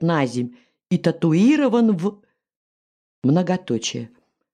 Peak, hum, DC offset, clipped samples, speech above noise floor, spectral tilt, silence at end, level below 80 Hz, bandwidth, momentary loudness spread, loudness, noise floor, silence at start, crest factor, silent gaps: -4 dBFS; none; under 0.1%; under 0.1%; over 71 dB; -6.5 dB/octave; 0.45 s; -68 dBFS; 10 kHz; 12 LU; -20 LUFS; under -90 dBFS; 0 s; 16 dB; 2.56-3.22 s